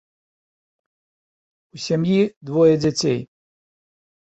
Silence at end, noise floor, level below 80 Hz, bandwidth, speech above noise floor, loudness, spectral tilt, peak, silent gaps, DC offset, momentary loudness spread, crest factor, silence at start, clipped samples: 1 s; under -90 dBFS; -60 dBFS; 8.2 kHz; over 72 dB; -19 LUFS; -6 dB/octave; -4 dBFS; 2.36-2.41 s; under 0.1%; 9 LU; 18 dB; 1.75 s; under 0.1%